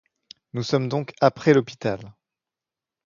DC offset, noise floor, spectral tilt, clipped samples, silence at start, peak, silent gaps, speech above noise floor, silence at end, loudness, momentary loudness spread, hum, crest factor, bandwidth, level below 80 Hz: under 0.1%; -89 dBFS; -6.5 dB/octave; under 0.1%; 0.55 s; -2 dBFS; none; 67 dB; 0.95 s; -22 LUFS; 13 LU; none; 22 dB; 7.4 kHz; -62 dBFS